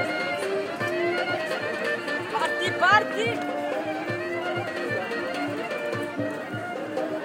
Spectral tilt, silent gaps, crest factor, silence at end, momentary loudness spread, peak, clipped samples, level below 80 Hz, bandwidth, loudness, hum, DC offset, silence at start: -4.5 dB/octave; none; 22 dB; 0 s; 9 LU; -4 dBFS; under 0.1%; -70 dBFS; 16.5 kHz; -27 LUFS; none; under 0.1%; 0 s